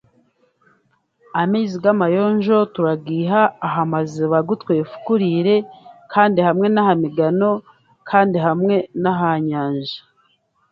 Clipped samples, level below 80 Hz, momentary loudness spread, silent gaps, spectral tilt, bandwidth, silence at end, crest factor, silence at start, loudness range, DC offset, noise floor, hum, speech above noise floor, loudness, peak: under 0.1%; -64 dBFS; 6 LU; none; -8 dB/octave; 7.2 kHz; 0.7 s; 18 dB; 1.35 s; 2 LU; under 0.1%; -62 dBFS; none; 45 dB; -18 LUFS; 0 dBFS